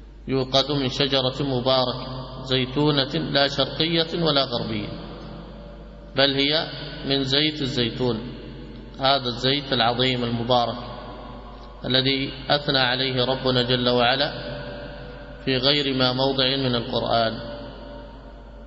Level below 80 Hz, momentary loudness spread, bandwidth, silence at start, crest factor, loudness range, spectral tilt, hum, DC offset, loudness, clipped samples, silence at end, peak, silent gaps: -44 dBFS; 19 LU; 7.8 kHz; 0 s; 18 dB; 2 LU; -5.5 dB/octave; none; under 0.1%; -22 LUFS; under 0.1%; 0 s; -4 dBFS; none